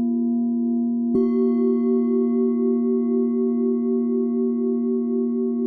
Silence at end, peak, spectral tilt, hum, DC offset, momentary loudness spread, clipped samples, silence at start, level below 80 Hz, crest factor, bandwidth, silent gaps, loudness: 0 s; -10 dBFS; -12 dB/octave; none; under 0.1%; 3 LU; under 0.1%; 0 s; -64 dBFS; 10 dB; 2.2 kHz; none; -21 LUFS